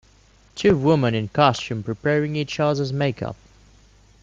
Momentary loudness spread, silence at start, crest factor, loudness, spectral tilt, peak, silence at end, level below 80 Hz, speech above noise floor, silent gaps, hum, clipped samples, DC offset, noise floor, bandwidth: 13 LU; 0.55 s; 20 dB; -21 LUFS; -6.5 dB/octave; -2 dBFS; 0.9 s; -52 dBFS; 34 dB; none; none; under 0.1%; under 0.1%; -54 dBFS; 7.6 kHz